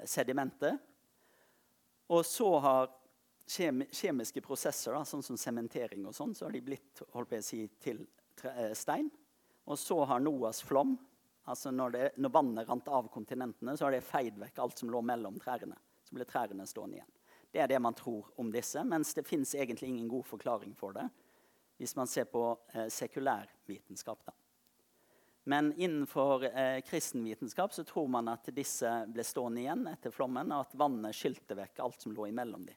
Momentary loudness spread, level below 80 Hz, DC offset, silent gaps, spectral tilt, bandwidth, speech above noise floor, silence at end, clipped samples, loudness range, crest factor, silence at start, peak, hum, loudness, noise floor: 13 LU; -84 dBFS; under 0.1%; none; -4 dB/octave; 19 kHz; 37 dB; 0 s; under 0.1%; 6 LU; 22 dB; 0 s; -14 dBFS; none; -37 LUFS; -73 dBFS